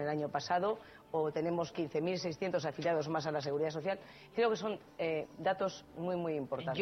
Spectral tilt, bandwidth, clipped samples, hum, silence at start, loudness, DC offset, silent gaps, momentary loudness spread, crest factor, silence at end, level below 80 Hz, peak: -6 dB/octave; 6.4 kHz; under 0.1%; none; 0 s; -36 LUFS; under 0.1%; none; 6 LU; 16 dB; 0 s; -72 dBFS; -20 dBFS